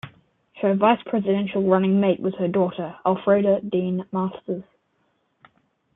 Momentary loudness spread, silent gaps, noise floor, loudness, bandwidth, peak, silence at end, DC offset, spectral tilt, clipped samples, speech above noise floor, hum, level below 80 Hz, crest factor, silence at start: 8 LU; none; -69 dBFS; -22 LUFS; 3.9 kHz; -4 dBFS; 1.35 s; under 0.1%; -10.5 dB/octave; under 0.1%; 48 dB; none; -64 dBFS; 18 dB; 0.05 s